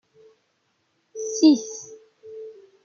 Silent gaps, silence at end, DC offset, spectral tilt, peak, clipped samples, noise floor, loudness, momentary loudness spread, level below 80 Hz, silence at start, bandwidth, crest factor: none; 0.35 s; under 0.1%; -3 dB/octave; -4 dBFS; under 0.1%; -71 dBFS; -20 LUFS; 25 LU; -82 dBFS; 1.15 s; 7.4 kHz; 20 dB